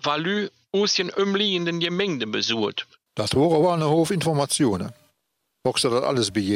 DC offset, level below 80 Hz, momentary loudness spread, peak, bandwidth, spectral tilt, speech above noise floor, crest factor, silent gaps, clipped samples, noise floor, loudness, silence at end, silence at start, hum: under 0.1%; -58 dBFS; 8 LU; -8 dBFS; 16 kHz; -4.5 dB/octave; 54 dB; 16 dB; none; under 0.1%; -76 dBFS; -22 LUFS; 0 s; 0.05 s; none